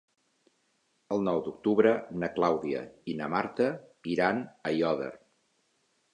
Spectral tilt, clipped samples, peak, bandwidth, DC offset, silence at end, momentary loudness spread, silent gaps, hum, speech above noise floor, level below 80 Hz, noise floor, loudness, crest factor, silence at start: -7 dB/octave; under 0.1%; -10 dBFS; 10 kHz; under 0.1%; 1 s; 11 LU; none; none; 44 dB; -68 dBFS; -73 dBFS; -30 LUFS; 22 dB; 1.1 s